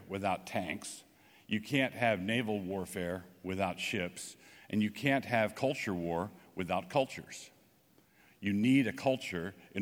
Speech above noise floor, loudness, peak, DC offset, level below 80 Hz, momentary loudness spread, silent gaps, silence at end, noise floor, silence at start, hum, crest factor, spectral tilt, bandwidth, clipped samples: 33 dB; -34 LUFS; -14 dBFS; under 0.1%; -70 dBFS; 13 LU; none; 0 s; -67 dBFS; 0 s; none; 22 dB; -5.5 dB/octave; 18.5 kHz; under 0.1%